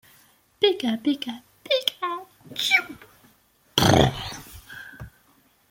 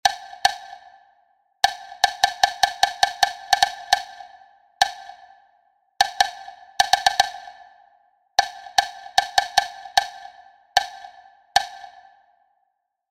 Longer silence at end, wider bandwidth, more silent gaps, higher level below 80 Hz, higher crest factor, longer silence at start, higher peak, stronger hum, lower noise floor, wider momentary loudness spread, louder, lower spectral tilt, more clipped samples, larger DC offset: second, 0.65 s vs 1.25 s; about the same, 17 kHz vs 16 kHz; neither; first, -48 dBFS vs -58 dBFS; about the same, 24 dB vs 24 dB; first, 0.6 s vs 0.05 s; about the same, -2 dBFS vs 0 dBFS; neither; second, -61 dBFS vs -73 dBFS; about the same, 22 LU vs 20 LU; about the same, -23 LUFS vs -22 LUFS; first, -4.5 dB/octave vs 1.5 dB/octave; neither; neither